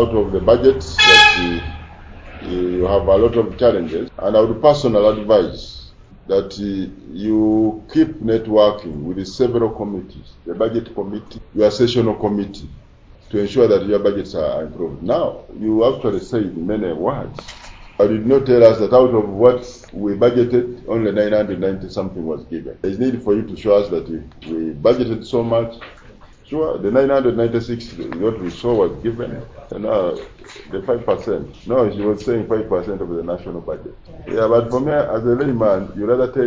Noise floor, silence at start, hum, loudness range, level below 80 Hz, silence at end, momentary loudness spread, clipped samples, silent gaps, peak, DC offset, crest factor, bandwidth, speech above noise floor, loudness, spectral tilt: -43 dBFS; 0 s; none; 6 LU; -40 dBFS; 0 s; 15 LU; under 0.1%; none; 0 dBFS; under 0.1%; 18 dB; 8 kHz; 26 dB; -17 LUFS; -5.5 dB/octave